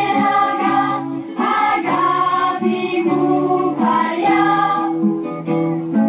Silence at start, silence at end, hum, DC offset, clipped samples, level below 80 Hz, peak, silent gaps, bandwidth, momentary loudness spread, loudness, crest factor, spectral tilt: 0 s; 0 s; none; under 0.1%; under 0.1%; -62 dBFS; -4 dBFS; none; 4 kHz; 5 LU; -17 LUFS; 12 dB; -10 dB/octave